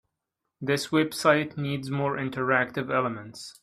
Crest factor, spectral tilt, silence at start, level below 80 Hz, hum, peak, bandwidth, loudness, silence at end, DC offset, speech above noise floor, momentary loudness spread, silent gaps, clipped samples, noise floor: 22 dB; -5.5 dB/octave; 0.6 s; -68 dBFS; none; -6 dBFS; 15 kHz; -26 LUFS; 0.1 s; under 0.1%; 57 dB; 9 LU; none; under 0.1%; -84 dBFS